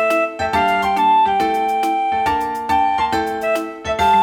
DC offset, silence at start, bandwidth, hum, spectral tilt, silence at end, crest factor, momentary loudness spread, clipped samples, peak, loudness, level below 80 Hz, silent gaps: under 0.1%; 0 s; 19 kHz; none; -4.5 dB/octave; 0 s; 12 dB; 6 LU; under 0.1%; -4 dBFS; -17 LUFS; -44 dBFS; none